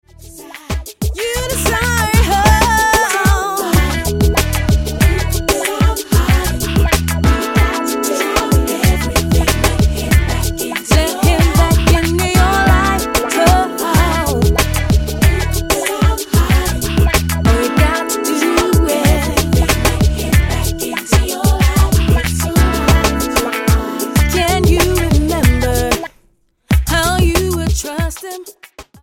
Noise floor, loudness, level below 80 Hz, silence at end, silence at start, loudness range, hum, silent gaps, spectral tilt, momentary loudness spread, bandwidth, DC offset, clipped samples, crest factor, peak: -55 dBFS; -14 LUFS; -18 dBFS; 0.2 s; 0.2 s; 2 LU; none; none; -4.5 dB/octave; 6 LU; 17 kHz; under 0.1%; under 0.1%; 14 dB; 0 dBFS